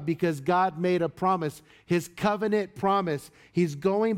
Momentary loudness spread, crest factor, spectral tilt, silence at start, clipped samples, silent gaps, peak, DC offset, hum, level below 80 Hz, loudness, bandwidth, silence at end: 6 LU; 14 dB; -6.5 dB/octave; 0 s; under 0.1%; none; -12 dBFS; under 0.1%; none; -64 dBFS; -27 LUFS; 16 kHz; 0 s